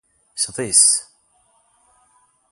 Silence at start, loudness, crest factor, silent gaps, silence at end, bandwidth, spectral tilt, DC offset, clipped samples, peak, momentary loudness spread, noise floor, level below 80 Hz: 0.35 s; -15 LUFS; 22 dB; none; 1.5 s; 12 kHz; 0 dB/octave; under 0.1%; under 0.1%; 0 dBFS; 13 LU; -61 dBFS; -62 dBFS